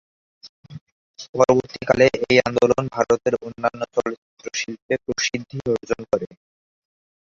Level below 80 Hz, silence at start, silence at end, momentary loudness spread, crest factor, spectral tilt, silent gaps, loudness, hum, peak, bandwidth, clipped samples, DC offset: -54 dBFS; 0.45 s; 1.15 s; 13 LU; 22 dB; -4.5 dB/octave; 0.49-0.63 s, 0.81-1.14 s, 1.29-1.33 s, 4.18-4.37 s, 4.82-4.89 s; -21 LUFS; none; 0 dBFS; 7.6 kHz; under 0.1%; under 0.1%